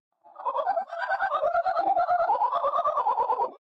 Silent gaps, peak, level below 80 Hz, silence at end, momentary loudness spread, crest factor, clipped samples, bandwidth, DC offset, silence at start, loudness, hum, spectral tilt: none; -16 dBFS; -66 dBFS; 0.2 s; 6 LU; 10 dB; under 0.1%; 6.2 kHz; under 0.1%; 0.35 s; -26 LUFS; none; -4.5 dB/octave